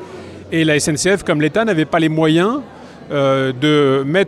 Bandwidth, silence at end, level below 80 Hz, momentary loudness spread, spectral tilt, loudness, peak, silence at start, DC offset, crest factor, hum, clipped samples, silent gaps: 13.5 kHz; 0 s; -50 dBFS; 10 LU; -5 dB/octave; -15 LUFS; -4 dBFS; 0 s; under 0.1%; 12 dB; none; under 0.1%; none